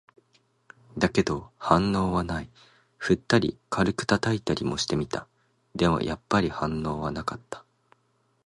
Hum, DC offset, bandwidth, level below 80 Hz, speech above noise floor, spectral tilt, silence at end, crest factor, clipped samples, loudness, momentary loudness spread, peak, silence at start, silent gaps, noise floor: none; under 0.1%; 11.5 kHz; -48 dBFS; 43 dB; -5.5 dB/octave; 0.85 s; 24 dB; under 0.1%; -27 LUFS; 12 LU; -4 dBFS; 0.95 s; none; -69 dBFS